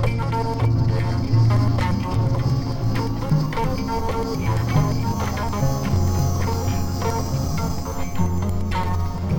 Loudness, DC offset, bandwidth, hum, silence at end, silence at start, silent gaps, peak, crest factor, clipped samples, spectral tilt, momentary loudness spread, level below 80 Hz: -22 LUFS; under 0.1%; 18.5 kHz; none; 0 s; 0 s; none; -6 dBFS; 14 dB; under 0.1%; -6.5 dB/octave; 5 LU; -30 dBFS